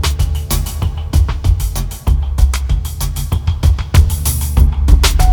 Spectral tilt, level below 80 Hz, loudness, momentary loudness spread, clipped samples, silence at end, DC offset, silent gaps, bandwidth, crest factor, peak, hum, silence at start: -4.5 dB/octave; -14 dBFS; -15 LUFS; 8 LU; 0.5%; 0 s; under 0.1%; none; 20 kHz; 12 dB; 0 dBFS; none; 0 s